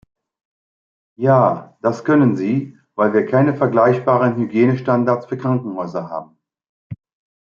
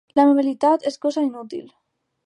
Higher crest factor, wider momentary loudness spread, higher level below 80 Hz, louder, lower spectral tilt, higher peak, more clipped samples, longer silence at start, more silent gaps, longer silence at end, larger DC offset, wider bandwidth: about the same, 16 dB vs 16 dB; about the same, 15 LU vs 17 LU; first, -64 dBFS vs -74 dBFS; about the same, -17 LUFS vs -19 LUFS; first, -9.5 dB/octave vs -5 dB/octave; about the same, -2 dBFS vs -4 dBFS; neither; first, 1.2 s vs 0.15 s; first, 6.69-6.90 s vs none; second, 0.5 s vs 0.65 s; neither; second, 7.2 kHz vs 10 kHz